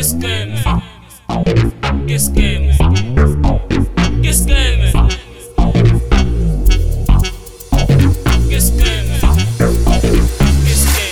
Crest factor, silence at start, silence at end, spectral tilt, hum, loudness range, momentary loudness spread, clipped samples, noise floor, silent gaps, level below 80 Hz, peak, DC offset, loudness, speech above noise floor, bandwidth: 12 dB; 0 s; 0 s; -5 dB/octave; none; 2 LU; 6 LU; under 0.1%; -32 dBFS; none; -14 dBFS; 0 dBFS; 3%; -14 LUFS; 20 dB; 18.5 kHz